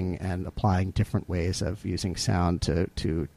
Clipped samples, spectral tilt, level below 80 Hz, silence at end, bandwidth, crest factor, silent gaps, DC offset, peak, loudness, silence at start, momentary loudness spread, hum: under 0.1%; -6 dB/octave; -40 dBFS; 0.1 s; 13 kHz; 16 dB; none; under 0.1%; -12 dBFS; -28 LUFS; 0 s; 5 LU; none